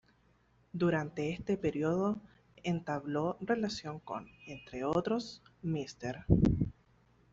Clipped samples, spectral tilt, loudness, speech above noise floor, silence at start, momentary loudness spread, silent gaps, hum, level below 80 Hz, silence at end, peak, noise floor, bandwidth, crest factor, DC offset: under 0.1%; -7 dB/octave; -35 LUFS; 35 dB; 0.75 s; 13 LU; none; none; -50 dBFS; 0.6 s; -10 dBFS; -69 dBFS; 7.8 kHz; 24 dB; under 0.1%